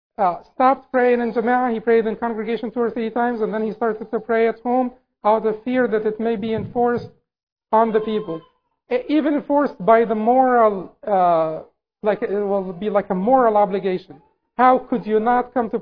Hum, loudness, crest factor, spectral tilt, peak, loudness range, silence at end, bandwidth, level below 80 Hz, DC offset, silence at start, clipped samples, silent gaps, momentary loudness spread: none; -20 LUFS; 18 dB; -9.5 dB/octave; -2 dBFS; 4 LU; 0 s; 5.2 kHz; -56 dBFS; 0.1%; 0.2 s; under 0.1%; 7.43-7.56 s; 9 LU